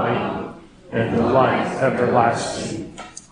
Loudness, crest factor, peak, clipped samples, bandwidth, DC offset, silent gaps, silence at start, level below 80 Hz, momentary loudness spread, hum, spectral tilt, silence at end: -20 LUFS; 18 dB; -2 dBFS; under 0.1%; 10 kHz; under 0.1%; none; 0 s; -50 dBFS; 15 LU; none; -5.5 dB/octave; 0.1 s